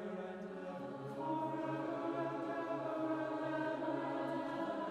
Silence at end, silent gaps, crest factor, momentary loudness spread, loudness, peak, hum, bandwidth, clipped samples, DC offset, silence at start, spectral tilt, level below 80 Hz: 0 s; none; 14 dB; 7 LU; -41 LUFS; -28 dBFS; none; 10.5 kHz; under 0.1%; under 0.1%; 0 s; -7.5 dB/octave; -80 dBFS